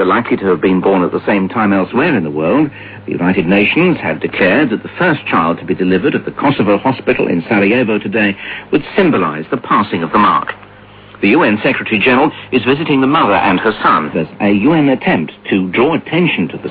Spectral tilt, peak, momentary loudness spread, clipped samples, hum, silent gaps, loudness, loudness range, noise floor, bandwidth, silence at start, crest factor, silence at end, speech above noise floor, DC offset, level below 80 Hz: -10 dB/octave; 0 dBFS; 6 LU; under 0.1%; none; none; -13 LUFS; 2 LU; -38 dBFS; 5 kHz; 0 s; 12 dB; 0 s; 25 dB; under 0.1%; -46 dBFS